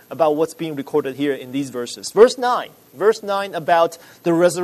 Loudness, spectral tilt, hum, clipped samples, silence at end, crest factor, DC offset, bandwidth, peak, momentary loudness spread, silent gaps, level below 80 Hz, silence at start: -19 LUFS; -4.5 dB/octave; none; under 0.1%; 0 s; 18 dB; under 0.1%; 13.5 kHz; 0 dBFS; 12 LU; none; -64 dBFS; 0.1 s